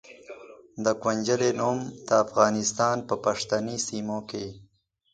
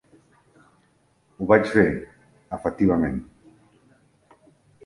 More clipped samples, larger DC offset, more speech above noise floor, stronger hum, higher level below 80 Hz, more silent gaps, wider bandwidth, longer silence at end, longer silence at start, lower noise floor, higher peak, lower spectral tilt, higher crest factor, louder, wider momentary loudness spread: neither; neither; second, 20 dB vs 43 dB; neither; second, -64 dBFS vs -48 dBFS; neither; second, 9.6 kHz vs 11.5 kHz; second, 0.5 s vs 1.65 s; second, 0.1 s vs 1.4 s; second, -46 dBFS vs -63 dBFS; second, -6 dBFS vs -2 dBFS; second, -4 dB/octave vs -8 dB/octave; about the same, 22 dB vs 24 dB; second, -26 LUFS vs -22 LUFS; first, 20 LU vs 16 LU